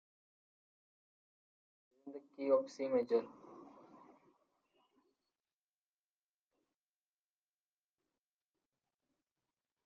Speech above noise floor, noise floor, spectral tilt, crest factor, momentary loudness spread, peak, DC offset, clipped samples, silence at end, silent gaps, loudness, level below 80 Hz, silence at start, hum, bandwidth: over 53 dB; under -90 dBFS; -4.5 dB/octave; 24 dB; 23 LU; -20 dBFS; under 0.1%; under 0.1%; 6.2 s; none; -37 LUFS; under -90 dBFS; 2.05 s; 50 Hz at -95 dBFS; 7.2 kHz